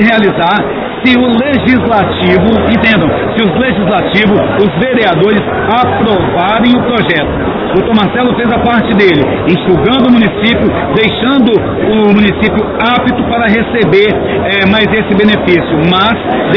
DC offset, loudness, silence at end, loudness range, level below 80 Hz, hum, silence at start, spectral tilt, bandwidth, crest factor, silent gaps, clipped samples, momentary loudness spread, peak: under 0.1%; -9 LUFS; 0 s; 1 LU; -30 dBFS; none; 0 s; -8.5 dB/octave; 5.4 kHz; 8 dB; none; 1%; 4 LU; 0 dBFS